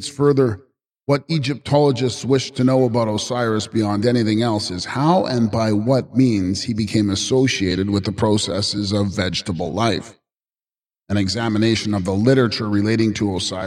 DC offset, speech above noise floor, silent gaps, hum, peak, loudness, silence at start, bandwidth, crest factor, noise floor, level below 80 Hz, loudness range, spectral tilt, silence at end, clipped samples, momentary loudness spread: under 0.1%; over 72 dB; none; none; -4 dBFS; -19 LUFS; 0 s; 12.5 kHz; 16 dB; under -90 dBFS; -50 dBFS; 3 LU; -5.5 dB/octave; 0 s; under 0.1%; 5 LU